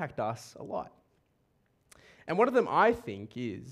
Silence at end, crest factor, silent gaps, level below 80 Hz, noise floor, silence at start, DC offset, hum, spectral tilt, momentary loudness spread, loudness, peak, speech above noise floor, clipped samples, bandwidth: 0 s; 20 dB; none; -66 dBFS; -72 dBFS; 0 s; under 0.1%; none; -6 dB/octave; 16 LU; -30 LUFS; -12 dBFS; 42 dB; under 0.1%; 13.5 kHz